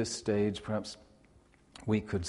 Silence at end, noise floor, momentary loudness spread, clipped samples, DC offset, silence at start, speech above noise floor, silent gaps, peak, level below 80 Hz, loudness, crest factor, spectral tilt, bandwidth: 0 s; -63 dBFS; 14 LU; under 0.1%; under 0.1%; 0 s; 30 dB; none; -16 dBFS; -58 dBFS; -34 LUFS; 18 dB; -5.5 dB/octave; 11.5 kHz